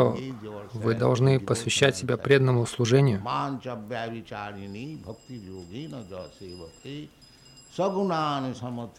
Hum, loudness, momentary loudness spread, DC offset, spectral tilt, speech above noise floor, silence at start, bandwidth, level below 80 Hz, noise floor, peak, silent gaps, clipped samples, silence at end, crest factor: none; -26 LUFS; 20 LU; under 0.1%; -5.5 dB/octave; 25 dB; 0 s; 13 kHz; -60 dBFS; -52 dBFS; -6 dBFS; none; under 0.1%; 0.1 s; 20 dB